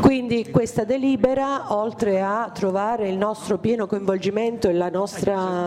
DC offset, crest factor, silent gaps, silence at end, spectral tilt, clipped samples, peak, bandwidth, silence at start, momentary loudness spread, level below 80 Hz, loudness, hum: under 0.1%; 16 dB; none; 0 s; -6.5 dB/octave; under 0.1%; -6 dBFS; 14.5 kHz; 0 s; 4 LU; -52 dBFS; -22 LUFS; none